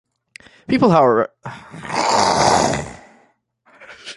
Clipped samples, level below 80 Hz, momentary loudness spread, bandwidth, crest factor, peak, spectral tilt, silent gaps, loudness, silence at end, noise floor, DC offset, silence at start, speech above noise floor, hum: under 0.1%; -46 dBFS; 21 LU; 11.5 kHz; 20 dB; 0 dBFS; -4.5 dB/octave; none; -16 LUFS; 0.05 s; -58 dBFS; under 0.1%; 0.7 s; 42 dB; none